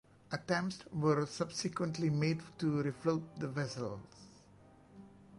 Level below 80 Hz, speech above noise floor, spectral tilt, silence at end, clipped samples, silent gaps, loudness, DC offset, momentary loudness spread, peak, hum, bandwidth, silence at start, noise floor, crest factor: -70 dBFS; 25 dB; -6 dB/octave; 0 s; under 0.1%; none; -36 LUFS; under 0.1%; 11 LU; -20 dBFS; none; 11.5 kHz; 0.3 s; -61 dBFS; 18 dB